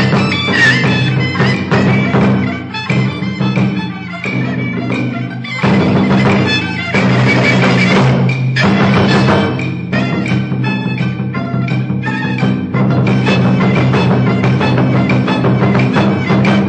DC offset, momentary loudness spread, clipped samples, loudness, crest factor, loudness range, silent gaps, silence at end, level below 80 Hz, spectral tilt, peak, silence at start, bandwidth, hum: under 0.1%; 7 LU; under 0.1%; -12 LUFS; 12 dB; 5 LU; none; 0 s; -42 dBFS; -7 dB/octave; 0 dBFS; 0 s; 8.6 kHz; none